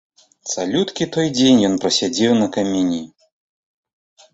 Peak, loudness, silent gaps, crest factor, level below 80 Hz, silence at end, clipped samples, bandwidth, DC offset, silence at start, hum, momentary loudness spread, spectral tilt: -2 dBFS; -18 LUFS; none; 16 dB; -56 dBFS; 1.25 s; under 0.1%; 8.2 kHz; under 0.1%; 0.45 s; none; 11 LU; -4.5 dB/octave